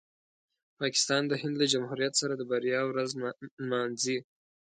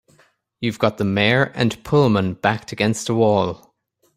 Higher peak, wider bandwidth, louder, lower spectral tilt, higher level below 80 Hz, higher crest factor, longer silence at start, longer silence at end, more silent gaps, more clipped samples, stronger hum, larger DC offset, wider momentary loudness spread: second, -14 dBFS vs -2 dBFS; second, 9.6 kHz vs 15.5 kHz; second, -30 LUFS vs -19 LUFS; second, -3 dB/octave vs -5.5 dB/octave; second, -78 dBFS vs -52 dBFS; about the same, 18 dB vs 18 dB; first, 0.8 s vs 0.6 s; second, 0.45 s vs 0.6 s; first, 3.51-3.57 s vs none; neither; neither; neither; about the same, 8 LU vs 9 LU